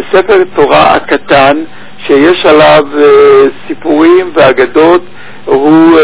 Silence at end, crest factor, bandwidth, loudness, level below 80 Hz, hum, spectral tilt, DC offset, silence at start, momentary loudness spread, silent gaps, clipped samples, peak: 0 s; 6 dB; 4 kHz; -5 LUFS; -38 dBFS; none; -9.5 dB/octave; 5%; 0 s; 8 LU; none; 10%; 0 dBFS